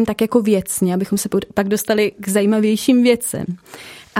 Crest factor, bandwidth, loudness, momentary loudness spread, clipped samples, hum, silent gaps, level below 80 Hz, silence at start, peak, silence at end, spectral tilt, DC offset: 16 dB; 16.5 kHz; -17 LUFS; 13 LU; under 0.1%; none; none; -52 dBFS; 0 s; -2 dBFS; 0 s; -5 dB/octave; under 0.1%